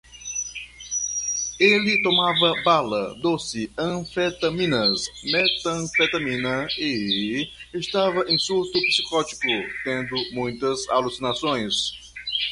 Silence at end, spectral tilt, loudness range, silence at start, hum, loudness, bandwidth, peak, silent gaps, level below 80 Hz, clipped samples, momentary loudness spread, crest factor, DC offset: 0 s; -2.5 dB/octave; 3 LU; 0.1 s; none; -22 LUFS; 11.5 kHz; -4 dBFS; none; -54 dBFS; under 0.1%; 10 LU; 20 dB; under 0.1%